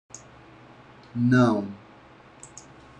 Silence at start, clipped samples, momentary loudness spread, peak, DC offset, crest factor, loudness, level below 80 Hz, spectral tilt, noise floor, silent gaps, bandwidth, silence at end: 0.15 s; under 0.1%; 26 LU; -8 dBFS; under 0.1%; 20 dB; -23 LUFS; -60 dBFS; -7 dB/octave; -51 dBFS; none; 9.6 kHz; 0.55 s